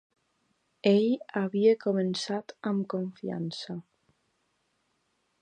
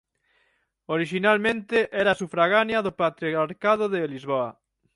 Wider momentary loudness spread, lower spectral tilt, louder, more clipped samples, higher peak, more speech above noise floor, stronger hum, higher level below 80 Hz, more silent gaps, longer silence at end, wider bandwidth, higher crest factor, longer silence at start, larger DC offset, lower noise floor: first, 11 LU vs 7 LU; about the same, -6.5 dB/octave vs -5.5 dB/octave; second, -29 LUFS vs -24 LUFS; neither; about the same, -10 dBFS vs -8 dBFS; about the same, 47 dB vs 46 dB; neither; second, -78 dBFS vs -64 dBFS; neither; first, 1.6 s vs 0.45 s; second, 9.4 kHz vs 11.5 kHz; about the same, 20 dB vs 18 dB; about the same, 0.85 s vs 0.9 s; neither; first, -75 dBFS vs -69 dBFS